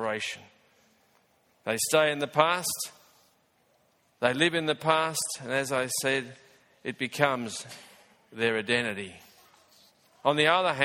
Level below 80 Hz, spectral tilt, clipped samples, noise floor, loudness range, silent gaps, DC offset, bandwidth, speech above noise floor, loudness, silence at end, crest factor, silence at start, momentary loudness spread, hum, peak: -72 dBFS; -3 dB/octave; under 0.1%; -68 dBFS; 3 LU; none; under 0.1%; 17.5 kHz; 40 dB; -27 LUFS; 0 s; 26 dB; 0 s; 15 LU; none; -4 dBFS